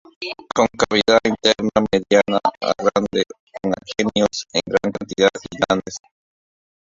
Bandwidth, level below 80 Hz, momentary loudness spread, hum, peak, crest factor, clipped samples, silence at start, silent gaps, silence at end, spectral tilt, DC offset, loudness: 7.8 kHz; -50 dBFS; 10 LU; none; 0 dBFS; 20 dB; under 0.1%; 0.2 s; 3.40-3.47 s; 0.9 s; -4 dB/octave; under 0.1%; -19 LUFS